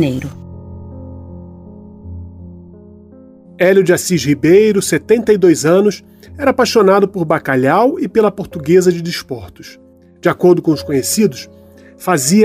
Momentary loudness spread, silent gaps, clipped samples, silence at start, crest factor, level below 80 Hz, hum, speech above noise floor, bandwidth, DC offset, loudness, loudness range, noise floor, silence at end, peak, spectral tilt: 22 LU; none; under 0.1%; 0 s; 14 dB; -46 dBFS; none; 27 dB; 16 kHz; under 0.1%; -13 LUFS; 6 LU; -40 dBFS; 0 s; 0 dBFS; -5 dB/octave